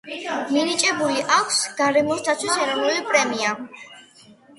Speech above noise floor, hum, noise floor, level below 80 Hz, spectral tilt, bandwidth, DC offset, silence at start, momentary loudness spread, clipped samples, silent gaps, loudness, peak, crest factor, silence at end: 29 dB; none; -50 dBFS; -68 dBFS; -1.5 dB/octave; 11.5 kHz; under 0.1%; 0.05 s; 9 LU; under 0.1%; none; -20 LUFS; -4 dBFS; 18 dB; 0.25 s